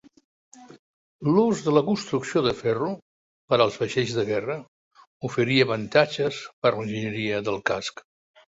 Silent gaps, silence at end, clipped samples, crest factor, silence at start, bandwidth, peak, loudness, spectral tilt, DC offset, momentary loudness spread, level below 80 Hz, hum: 0.79-1.19 s, 3.02-3.48 s, 4.68-4.91 s, 5.07-5.20 s, 6.53-6.62 s; 0.55 s; under 0.1%; 22 dB; 0.55 s; 8 kHz; -4 dBFS; -24 LUFS; -5.5 dB/octave; under 0.1%; 9 LU; -62 dBFS; none